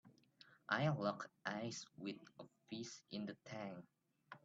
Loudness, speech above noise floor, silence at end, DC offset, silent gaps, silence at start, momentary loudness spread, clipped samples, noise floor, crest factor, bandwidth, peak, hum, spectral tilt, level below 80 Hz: -46 LUFS; 24 dB; 0.05 s; under 0.1%; none; 0.05 s; 21 LU; under 0.1%; -69 dBFS; 24 dB; 7.8 kHz; -22 dBFS; none; -5 dB/octave; -84 dBFS